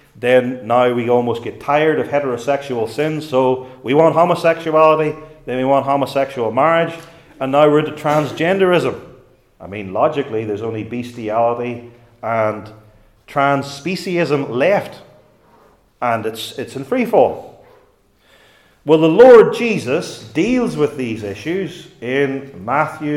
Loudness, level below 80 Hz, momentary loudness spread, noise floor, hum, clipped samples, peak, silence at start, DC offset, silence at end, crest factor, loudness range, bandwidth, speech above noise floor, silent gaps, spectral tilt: -16 LUFS; -54 dBFS; 13 LU; -54 dBFS; none; under 0.1%; 0 dBFS; 0.15 s; under 0.1%; 0 s; 16 dB; 8 LU; 14 kHz; 39 dB; none; -6.5 dB/octave